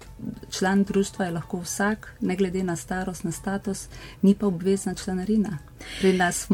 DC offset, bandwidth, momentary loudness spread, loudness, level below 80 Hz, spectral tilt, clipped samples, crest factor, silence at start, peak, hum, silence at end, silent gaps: under 0.1%; 17 kHz; 11 LU; -26 LUFS; -48 dBFS; -5.5 dB/octave; under 0.1%; 18 dB; 0 s; -8 dBFS; none; 0 s; none